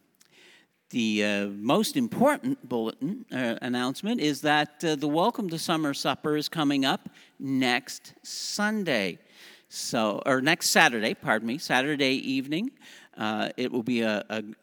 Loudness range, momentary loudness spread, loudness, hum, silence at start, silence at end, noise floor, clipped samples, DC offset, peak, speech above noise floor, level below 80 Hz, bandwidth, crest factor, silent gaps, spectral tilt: 3 LU; 10 LU; -27 LUFS; none; 0.9 s; 0.1 s; -58 dBFS; under 0.1%; under 0.1%; -2 dBFS; 31 dB; -78 dBFS; over 20 kHz; 24 dB; none; -4 dB/octave